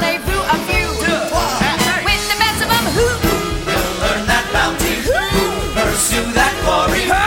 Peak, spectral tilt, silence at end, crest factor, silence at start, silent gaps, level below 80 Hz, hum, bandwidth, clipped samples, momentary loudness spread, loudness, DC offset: 0 dBFS; -3 dB/octave; 0 s; 16 dB; 0 s; none; -28 dBFS; none; 18 kHz; under 0.1%; 3 LU; -15 LUFS; under 0.1%